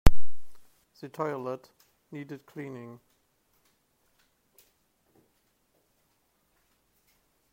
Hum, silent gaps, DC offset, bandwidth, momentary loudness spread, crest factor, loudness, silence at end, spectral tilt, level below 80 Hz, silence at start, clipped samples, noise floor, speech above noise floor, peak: none; none; under 0.1%; 14 kHz; 20 LU; 24 dB; -37 LUFS; 4.85 s; -6.5 dB/octave; -38 dBFS; 0.05 s; under 0.1%; -72 dBFS; 35 dB; -2 dBFS